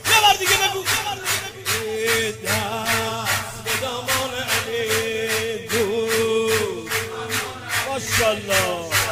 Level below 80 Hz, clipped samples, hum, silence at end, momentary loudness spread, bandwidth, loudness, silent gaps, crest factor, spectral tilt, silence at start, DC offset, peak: -50 dBFS; under 0.1%; none; 0 s; 7 LU; 16 kHz; -21 LUFS; none; 20 dB; -2 dB/octave; 0 s; under 0.1%; -2 dBFS